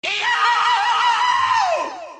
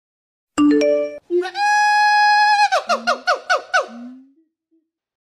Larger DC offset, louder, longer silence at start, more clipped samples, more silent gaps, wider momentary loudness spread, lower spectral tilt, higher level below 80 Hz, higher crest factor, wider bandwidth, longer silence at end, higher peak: neither; about the same, -17 LUFS vs -16 LUFS; second, 0.05 s vs 0.55 s; neither; neither; second, 3 LU vs 9 LU; second, 0.5 dB/octave vs -2 dB/octave; second, -72 dBFS vs -64 dBFS; about the same, 12 dB vs 12 dB; second, 9.6 kHz vs 12 kHz; second, 0 s vs 1.15 s; about the same, -6 dBFS vs -6 dBFS